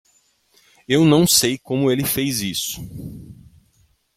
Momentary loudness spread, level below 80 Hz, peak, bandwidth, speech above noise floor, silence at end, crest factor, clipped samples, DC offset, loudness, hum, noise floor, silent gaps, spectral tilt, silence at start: 21 LU; -50 dBFS; -2 dBFS; 16.5 kHz; 42 dB; 0.85 s; 18 dB; under 0.1%; under 0.1%; -18 LUFS; none; -61 dBFS; none; -4 dB/octave; 0.9 s